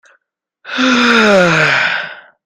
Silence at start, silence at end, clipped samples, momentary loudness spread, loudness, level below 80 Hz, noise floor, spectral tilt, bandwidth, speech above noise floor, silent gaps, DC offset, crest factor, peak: 0.65 s; 0.25 s; under 0.1%; 13 LU; -10 LUFS; -52 dBFS; -62 dBFS; -4 dB/octave; 13 kHz; 52 dB; none; under 0.1%; 14 dB; 0 dBFS